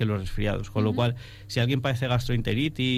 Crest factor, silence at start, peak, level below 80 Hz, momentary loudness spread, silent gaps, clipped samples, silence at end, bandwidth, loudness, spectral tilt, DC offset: 14 dB; 0 s; -12 dBFS; -40 dBFS; 4 LU; none; under 0.1%; 0 s; 15 kHz; -27 LUFS; -6.5 dB/octave; under 0.1%